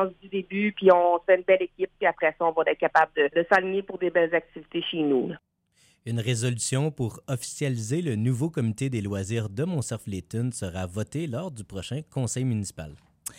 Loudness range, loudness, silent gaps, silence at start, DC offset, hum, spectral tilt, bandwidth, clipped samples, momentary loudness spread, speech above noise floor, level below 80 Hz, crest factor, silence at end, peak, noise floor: 8 LU; -26 LUFS; none; 0 s; under 0.1%; none; -5.5 dB/octave; 16 kHz; under 0.1%; 13 LU; 38 dB; -60 dBFS; 20 dB; 0.05 s; -6 dBFS; -64 dBFS